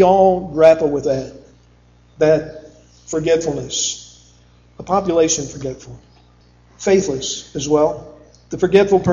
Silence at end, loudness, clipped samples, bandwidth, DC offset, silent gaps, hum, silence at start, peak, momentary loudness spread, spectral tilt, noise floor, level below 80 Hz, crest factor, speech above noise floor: 0 s; -17 LUFS; under 0.1%; 7.6 kHz; under 0.1%; none; 60 Hz at -55 dBFS; 0 s; 0 dBFS; 18 LU; -4.5 dB/octave; -50 dBFS; -46 dBFS; 18 dB; 34 dB